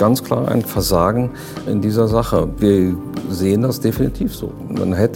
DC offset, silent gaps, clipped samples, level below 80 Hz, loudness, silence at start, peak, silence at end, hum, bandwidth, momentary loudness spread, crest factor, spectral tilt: under 0.1%; none; under 0.1%; -34 dBFS; -18 LUFS; 0 s; -2 dBFS; 0 s; none; 17 kHz; 9 LU; 16 dB; -6.5 dB/octave